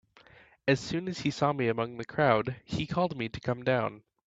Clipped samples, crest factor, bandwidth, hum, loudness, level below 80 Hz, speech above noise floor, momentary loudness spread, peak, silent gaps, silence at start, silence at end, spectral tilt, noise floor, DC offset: under 0.1%; 22 dB; 8 kHz; none; -30 LUFS; -60 dBFS; 29 dB; 9 LU; -10 dBFS; none; 0.65 s; 0.3 s; -6 dB/octave; -58 dBFS; under 0.1%